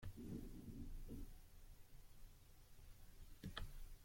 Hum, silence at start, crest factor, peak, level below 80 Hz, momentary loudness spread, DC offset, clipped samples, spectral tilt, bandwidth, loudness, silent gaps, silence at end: none; 0 s; 22 dB; -32 dBFS; -58 dBFS; 14 LU; under 0.1%; under 0.1%; -5.5 dB/octave; 16.5 kHz; -59 LUFS; none; 0 s